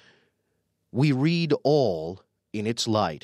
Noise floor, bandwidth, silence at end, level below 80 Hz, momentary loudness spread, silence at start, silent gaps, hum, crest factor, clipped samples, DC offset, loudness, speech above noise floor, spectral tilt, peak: -75 dBFS; 13 kHz; 0.05 s; -64 dBFS; 15 LU; 0.95 s; none; none; 16 dB; under 0.1%; under 0.1%; -25 LUFS; 51 dB; -6 dB/octave; -10 dBFS